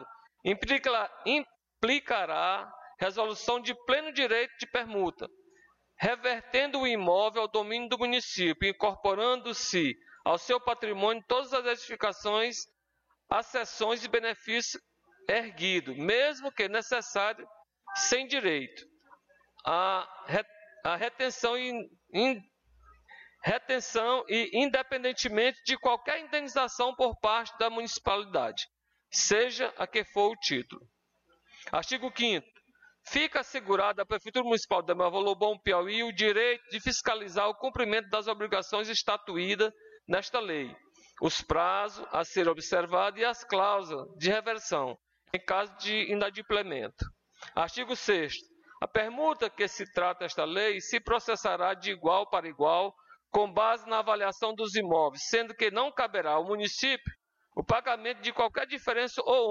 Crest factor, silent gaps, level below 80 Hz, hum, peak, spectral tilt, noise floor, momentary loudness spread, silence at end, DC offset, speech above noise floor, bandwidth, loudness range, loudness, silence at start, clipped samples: 16 dB; none; -58 dBFS; none; -14 dBFS; -2.5 dB/octave; -76 dBFS; 7 LU; 0 s; under 0.1%; 46 dB; 7.6 kHz; 3 LU; -30 LUFS; 0 s; under 0.1%